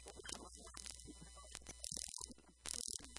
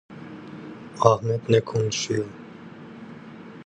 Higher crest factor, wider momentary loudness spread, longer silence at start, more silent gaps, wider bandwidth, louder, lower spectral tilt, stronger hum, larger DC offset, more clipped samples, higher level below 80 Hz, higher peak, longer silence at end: about the same, 28 dB vs 24 dB; second, 10 LU vs 22 LU; about the same, 0 s vs 0.1 s; neither; first, 11.5 kHz vs 9.6 kHz; second, -49 LUFS vs -23 LUFS; second, -1 dB/octave vs -5.5 dB/octave; neither; neither; neither; about the same, -64 dBFS vs -60 dBFS; second, -22 dBFS vs -2 dBFS; about the same, 0 s vs 0.05 s